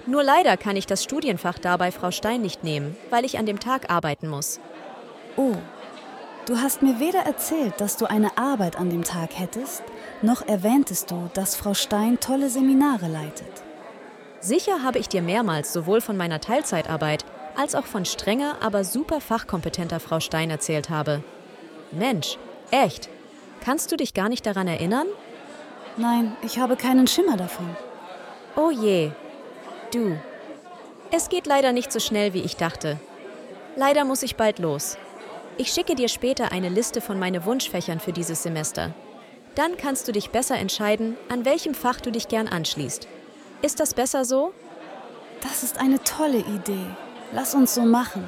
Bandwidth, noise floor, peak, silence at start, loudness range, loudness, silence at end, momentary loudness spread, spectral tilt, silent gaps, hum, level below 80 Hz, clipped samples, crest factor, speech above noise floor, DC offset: 17 kHz; -45 dBFS; -4 dBFS; 0 s; 3 LU; -24 LUFS; 0 s; 19 LU; -4 dB/octave; none; none; -56 dBFS; under 0.1%; 20 dB; 22 dB; under 0.1%